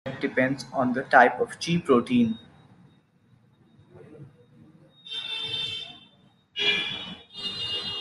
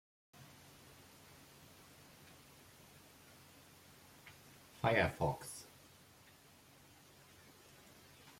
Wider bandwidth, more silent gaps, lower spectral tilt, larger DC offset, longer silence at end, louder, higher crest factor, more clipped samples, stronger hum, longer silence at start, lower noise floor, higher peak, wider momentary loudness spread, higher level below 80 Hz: second, 12 kHz vs 16.5 kHz; neither; about the same, -4.5 dB/octave vs -5 dB/octave; neither; about the same, 0 s vs 0.1 s; first, -25 LUFS vs -37 LUFS; about the same, 24 dB vs 28 dB; neither; neither; second, 0.05 s vs 0.4 s; about the same, -61 dBFS vs -64 dBFS; first, -4 dBFS vs -18 dBFS; second, 16 LU vs 25 LU; about the same, -66 dBFS vs -68 dBFS